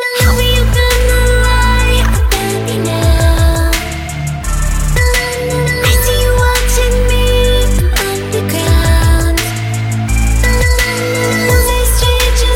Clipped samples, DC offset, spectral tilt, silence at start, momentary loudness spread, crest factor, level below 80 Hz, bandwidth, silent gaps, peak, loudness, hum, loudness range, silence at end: under 0.1%; under 0.1%; -4 dB/octave; 0 s; 5 LU; 10 dB; -14 dBFS; 17 kHz; none; 0 dBFS; -12 LUFS; none; 2 LU; 0 s